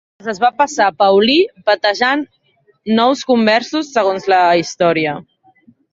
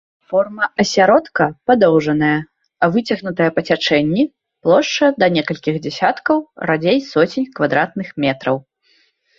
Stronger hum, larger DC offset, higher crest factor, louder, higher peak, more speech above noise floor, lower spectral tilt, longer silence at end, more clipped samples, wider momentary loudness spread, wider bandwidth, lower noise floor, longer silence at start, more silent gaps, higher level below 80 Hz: neither; neither; about the same, 14 dB vs 16 dB; about the same, -14 LUFS vs -16 LUFS; about the same, 0 dBFS vs 0 dBFS; second, 37 dB vs 43 dB; second, -4 dB/octave vs -5.5 dB/octave; about the same, 0.7 s vs 0.8 s; neither; about the same, 9 LU vs 8 LU; about the same, 7.8 kHz vs 7.6 kHz; second, -51 dBFS vs -59 dBFS; about the same, 0.25 s vs 0.3 s; neither; about the same, -60 dBFS vs -56 dBFS